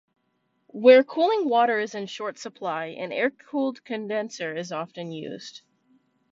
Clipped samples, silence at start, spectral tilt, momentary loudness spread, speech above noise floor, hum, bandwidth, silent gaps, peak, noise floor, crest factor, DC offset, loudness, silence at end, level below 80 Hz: under 0.1%; 0.75 s; -4.5 dB/octave; 18 LU; 48 dB; none; 7.6 kHz; none; -4 dBFS; -72 dBFS; 22 dB; under 0.1%; -24 LUFS; 0.75 s; -78 dBFS